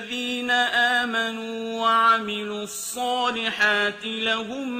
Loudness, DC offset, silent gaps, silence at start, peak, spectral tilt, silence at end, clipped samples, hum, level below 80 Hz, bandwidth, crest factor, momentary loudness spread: -22 LUFS; under 0.1%; none; 0 s; -6 dBFS; -2 dB/octave; 0 s; under 0.1%; none; -68 dBFS; 15.5 kHz; 18 dB; 11 LU